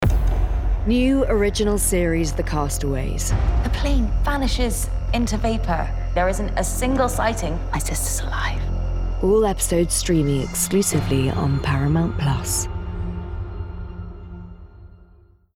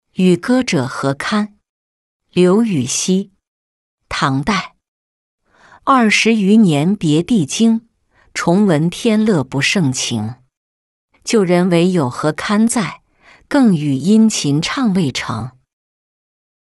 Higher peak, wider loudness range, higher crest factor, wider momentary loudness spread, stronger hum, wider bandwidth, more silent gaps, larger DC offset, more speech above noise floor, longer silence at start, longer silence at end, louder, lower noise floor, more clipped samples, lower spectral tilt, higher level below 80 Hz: second, -8 dBFS vs -2 dBFS; about the same, 4 LU vs 4 LU; about the same, 12 dB vs 14 dB; about the same, 11 LU vs 11 LU; neither; first, 16.5 kHz vs 12 kHz; second, none vs 1.69-2.20 s, 3.48-3.98 s, 4.88-5.38 s, 10.57-11.08 s; neither; about the same, 32 dB vs 35 dB; second, 0 s vs 0.2 s; second, 0.7 s vs 1.15 s; second, -22 LUFS vs -15 LUFS; about the same, -52 dBFS vs -49 dBFS; neither; about the same, -5 dB/octave vs -5 dB/octave; first, -24 dBFS vs -50 dBFS